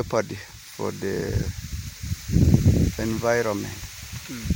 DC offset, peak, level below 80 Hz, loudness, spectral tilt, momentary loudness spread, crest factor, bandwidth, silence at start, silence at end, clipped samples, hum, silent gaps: under 0.1%; -4 dBFS; -34 dBFS; -25 LUFS; -6 dB/octave; 16 LU; 20 dB; 17 kHz; 0 s; 0 s; under 0.1%; none; none